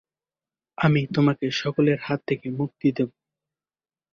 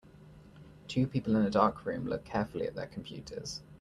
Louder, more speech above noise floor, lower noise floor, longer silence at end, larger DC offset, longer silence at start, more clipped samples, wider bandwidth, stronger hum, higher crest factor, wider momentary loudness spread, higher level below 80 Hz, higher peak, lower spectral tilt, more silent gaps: first, -24 LUFS vs -33 LUFS; first, over 67 dB vs 22 dB; first, under -90 dBFS vs -54 dBFS; first, 1.05 s vs 0.05 s; neither; first, 0.8 s vs 0.15 s; neither; second, 7.2 kHz vs 11.5 kHz; neither; second, 18 dB vs 24 dB; second, 8 LU vs 14 LU; about the same, -62 dBFS vs -58 dBFS; about the same, -8 dBFS vs -10 dBFS; about the same, -7 dB/octave vs -6.5 dB/octave; neither